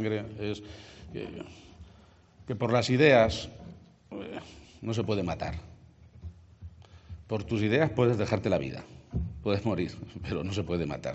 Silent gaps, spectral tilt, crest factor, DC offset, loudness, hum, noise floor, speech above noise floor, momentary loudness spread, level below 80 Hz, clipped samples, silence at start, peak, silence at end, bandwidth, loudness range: none; -5.5 dB/octave; 22 dB; under 0.1%; -29 LUFS; none; -57 dBFS; 28 dB; 24 LU; -52 dBFS; under 0.1%; 0 s; -8 dBFS; 0 s; 8 kHz; 9 LU